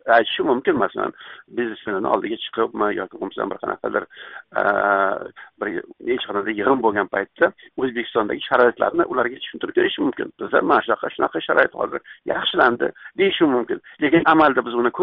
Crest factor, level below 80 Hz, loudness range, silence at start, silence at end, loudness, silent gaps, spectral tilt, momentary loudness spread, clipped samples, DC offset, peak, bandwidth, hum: 18 dB; -60 dBFS; 4 LU; 0.05 s; 0 s; -21 LUFS; none; -2 dB/octave; 11 LU; under 0.1%; under 0.1%; -4 dBFS; 5.2 kHz; none